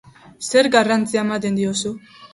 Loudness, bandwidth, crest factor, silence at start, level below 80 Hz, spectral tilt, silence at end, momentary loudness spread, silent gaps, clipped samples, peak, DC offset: -18 LUFS; 11.5 kHz; 18 dB; 0.4 s; -60 dBFS; -4 dB/octave; 0.1 s; 14 LU; none; under 0.1%; -2 dBFS; under 0.1%